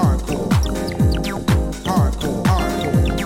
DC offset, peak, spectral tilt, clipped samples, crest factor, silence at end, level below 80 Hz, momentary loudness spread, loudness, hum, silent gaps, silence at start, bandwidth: under 0.1%; -4 dBFS; -6.5 dB/octave; under 0.1%; 14 dB; 0 s; -24 dBFS; 2 LU; -19 LUFS; none; none; 0 s; 16.5 kHz